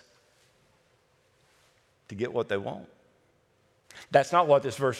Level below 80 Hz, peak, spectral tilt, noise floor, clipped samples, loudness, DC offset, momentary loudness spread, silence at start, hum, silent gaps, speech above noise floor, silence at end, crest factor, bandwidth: -76 dBFS; -6 dBFS; -5.5 dB/octave; -67 dBFS; under 0.1%; -26 LUFS; under 0.1%; 22 LU; 2.1 s; none; none; 41 dB; 0 s; 24 dB; 13 kHz